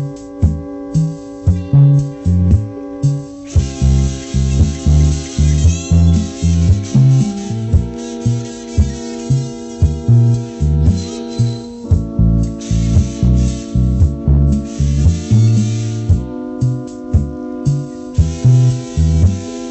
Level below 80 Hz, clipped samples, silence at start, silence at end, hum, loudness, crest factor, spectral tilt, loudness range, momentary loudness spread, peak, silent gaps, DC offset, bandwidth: -22 dBFS; under 0.1%; 0 s; 0 s; none; -15 LUFS; 12 dB; -7.5 dB/octave; 3 LU; 9 LU; -2 dBFS; none; under 0.1%; 8.4 kHz